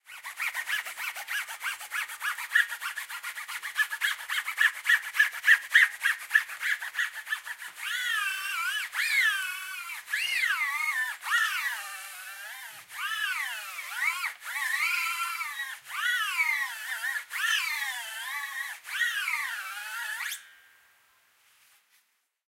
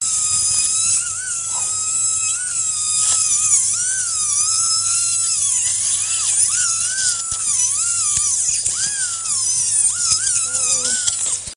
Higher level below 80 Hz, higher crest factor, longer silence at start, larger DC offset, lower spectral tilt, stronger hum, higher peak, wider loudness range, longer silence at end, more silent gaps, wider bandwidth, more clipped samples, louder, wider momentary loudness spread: second, -86 dBFS vs -54 dBFS; first, 24 dB vs 18 dB; about the same, 0.05 s vs 0 s; neither; second, 5 dB/octave vs 2 dB/octave; neither; second, -8 dBFS vs 0 dBFS; first, 8 LU vs 1 LU; first, 2 s vs 0 s; neither; first, 16 kHz vs 10.5 kHz; neither; second, -28 LUFS vs -15 LUFS; first, 12 LU vs 4 LU